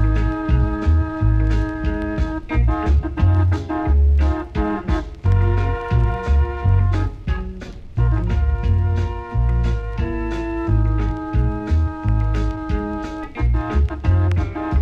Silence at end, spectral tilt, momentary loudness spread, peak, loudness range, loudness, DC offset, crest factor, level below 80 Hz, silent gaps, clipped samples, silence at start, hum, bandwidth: 0 s; -9 dB/octave; 7 LU; -4 dBFS; 3 LU; -20 LUFS; under 0.1%; 14 dB; -20 dBFS; none; under 0.1%; 0 s; none; 6.8 kHz